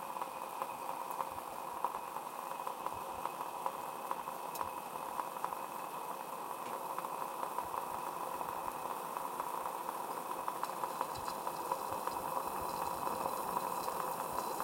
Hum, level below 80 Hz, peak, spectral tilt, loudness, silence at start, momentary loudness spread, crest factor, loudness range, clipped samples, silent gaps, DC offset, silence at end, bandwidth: none; -72 dBFS; -20 dBFS; -3 dB/octave; -41 LUFS; 0 s; 5 LU; 20 dB; 3 LU; under 0.1%; none; under 0.1%; 0 s; 16.5 kHz